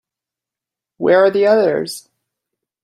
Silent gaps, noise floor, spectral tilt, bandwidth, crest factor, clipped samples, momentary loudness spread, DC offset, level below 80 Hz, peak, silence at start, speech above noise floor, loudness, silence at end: none; -87 dBFS; -5 dB/octave; 15.5 kHz; 16 dB; under 0.1%; 14 LU; under 0.1%; -66 dBFS; -2 dBFS; 1 s; 73 dB; -14 LUFS; 0.85 s